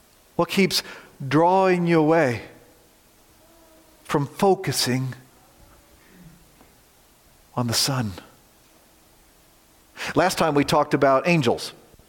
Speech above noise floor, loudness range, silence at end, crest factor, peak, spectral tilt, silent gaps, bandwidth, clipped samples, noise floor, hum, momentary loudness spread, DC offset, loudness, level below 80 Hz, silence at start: 35 dB; 7 LU; 0.4 s; 18 dB; -6 dBFS; -5 dB/octave; none; 17 kHz; under 0.1%; -56 dBFS; none; 15 LU; under 0.1%; -21 LUFS; -58 dBFS; 0.4 s